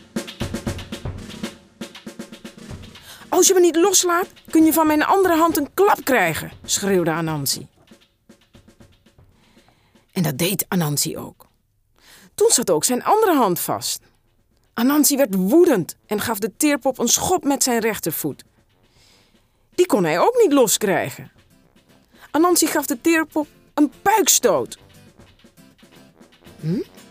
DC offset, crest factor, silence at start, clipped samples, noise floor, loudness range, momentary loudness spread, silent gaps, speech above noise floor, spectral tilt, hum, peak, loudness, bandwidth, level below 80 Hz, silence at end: under 0.1%; 20 dB; 0.15 s; under 0.1%; -63 dBFS; 8 LU; 19 LU; none; 45 dB; -3.5 dB/octave; none; 0 dBFS; -18 LUFS; 16 kHz; -52 dBFS; 0.25 s